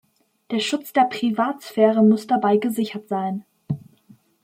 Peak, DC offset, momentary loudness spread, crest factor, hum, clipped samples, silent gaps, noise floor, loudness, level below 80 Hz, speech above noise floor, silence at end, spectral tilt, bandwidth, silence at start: -4 dBFS; under 0.1%; 14 LU; 18 dB; none; under 0.1%; none; -54 dBFS; -21 LUFS; -70 dBFS; 34 dB; 0.65 s; -6 dB/octave; 16 kHz; 0.5 s